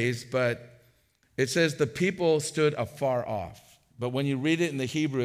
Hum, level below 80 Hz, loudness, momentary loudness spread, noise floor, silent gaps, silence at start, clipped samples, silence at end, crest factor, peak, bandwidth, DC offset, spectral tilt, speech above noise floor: none; -66 dBFS; -28 LUFS; 10 LU; -66 dBFS; none; 0 s; under 0.1%; 0 s; 16 dB; -12 dBFS; 16 kHz; under 0.1%; -5 dB/octave; 39 dB